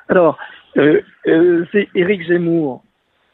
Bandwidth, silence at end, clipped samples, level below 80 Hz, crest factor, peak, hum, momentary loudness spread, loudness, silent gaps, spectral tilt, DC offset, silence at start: 4.1 kHz; 0.55 s; under 0.1%; -58 dBFS; 14 dB; 0 dBFS; none; 9 LU; -15 LUFS; none; -10 dB/octave; under 0.1%; 0.1 s